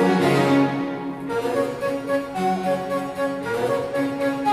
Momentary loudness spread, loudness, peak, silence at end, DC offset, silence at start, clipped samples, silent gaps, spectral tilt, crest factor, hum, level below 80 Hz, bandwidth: 8 LU; -23 LUFS; -6 dBFS; 0 s; under 0.1%; 0 s; under 0.1%; none; -6.5 dB/octave; 16 dB; none; -58 dBFS; 15.5 kHz